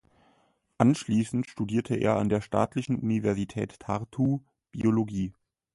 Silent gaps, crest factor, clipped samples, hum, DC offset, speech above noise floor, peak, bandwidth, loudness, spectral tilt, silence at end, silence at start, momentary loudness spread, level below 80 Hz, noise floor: none; 22 dB; under 0.1%; none; under 0.1%; 41 dB; -6 dBFS; 11.5 kHz; -28 LUFS; -7.5 dB/octave; 0.45 s; 0.8 s; 9 LU; -56 dBFS; -68 dBFS